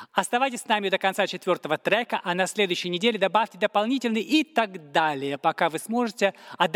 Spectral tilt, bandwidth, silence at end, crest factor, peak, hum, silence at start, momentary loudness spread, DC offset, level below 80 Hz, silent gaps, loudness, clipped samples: -3.5 dB/octave; 17 kHz; 0 s; 18 dB; -6 dBFS; none; 0 s; 4 LU; under 0.1%; -78 dBFS; none; -25 LUFS; under 0.1%